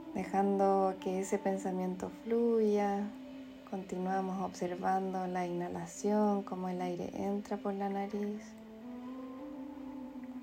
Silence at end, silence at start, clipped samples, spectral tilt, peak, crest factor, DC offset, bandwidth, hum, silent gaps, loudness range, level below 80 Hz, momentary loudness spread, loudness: 0 s; 0 s; under 0.1%; -7 dB/octave; -18 dBFS; 16 dB; under 0.1%; 16 kHz; none; none; 6 LU; -70 dBFS; 16 LU; -35 LUFS